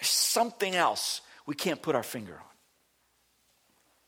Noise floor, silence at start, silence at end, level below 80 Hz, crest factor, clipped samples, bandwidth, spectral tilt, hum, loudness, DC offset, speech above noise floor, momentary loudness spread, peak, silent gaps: -71 dBFS; 0 s; 1.65 s; -76 dBFS; 20 dB; under 0.1%; over 20 kHz; -1.5 dB/octave; none; -29 LUFS; under 0.1%; 40 dB; 16 LU; -12 dBFS; none